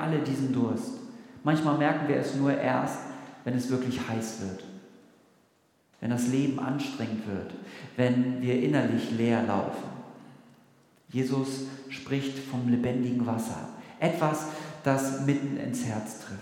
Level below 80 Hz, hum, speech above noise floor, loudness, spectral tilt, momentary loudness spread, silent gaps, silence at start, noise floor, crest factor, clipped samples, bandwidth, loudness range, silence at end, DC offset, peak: -72 dBFS; none; 38 dB; -29 LUFS; -6.5 dB/octave; 14 LU; none; 0 s; -67 dBFS; 20 dB; under 0.1%; 17 kHz; 5 LU; 0 s; under 0.1%; -10 dBFS